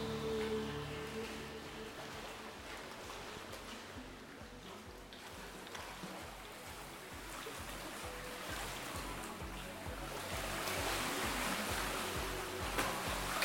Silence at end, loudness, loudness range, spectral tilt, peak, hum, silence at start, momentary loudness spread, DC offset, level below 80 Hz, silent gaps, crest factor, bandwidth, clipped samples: 0 s; -42 LUFS; 10 LU; -3 dB/octave; -20 dBFS; none; 0 s; 12 LU; under 0.1%; -54 dBFS; none; 22 dB; 17 kHz; under 0.1%